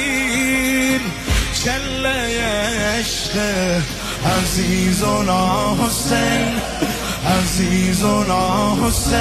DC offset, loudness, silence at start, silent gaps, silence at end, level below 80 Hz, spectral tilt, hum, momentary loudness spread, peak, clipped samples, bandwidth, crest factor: under 0.1%; -18 LUFS; 0 s; none; 0 s; -30 dBFS; -4 dB/octave; none; 4 LU; -4 dBFS; under 0.1%; 14 kHz; 14 dB